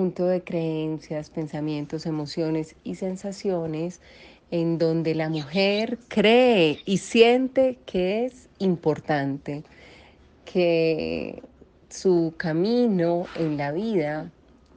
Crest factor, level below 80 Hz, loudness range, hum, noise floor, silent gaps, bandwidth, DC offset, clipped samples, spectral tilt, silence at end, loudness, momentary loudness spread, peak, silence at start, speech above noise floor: 20 dB; -58 dBFS; 8 LU; none; -52 dBFS; none; 9.4 kHz; under 0.1%; under 0.1%; -6 dB/octave; 0.45 s; -24 LUFS; 14 LU; -4 dBFS; 0 s; 29 dB